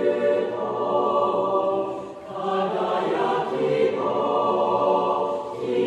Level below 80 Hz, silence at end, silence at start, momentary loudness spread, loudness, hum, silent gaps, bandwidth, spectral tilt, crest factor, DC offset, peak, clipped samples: -66 dBFS; 0 s; 0 s; 6 LU; -23 LUFS; none; none; 9.4 kHz; -6.5 dB/octave; 14 dB; under 0.1%; -10 dBFS; under 0.1%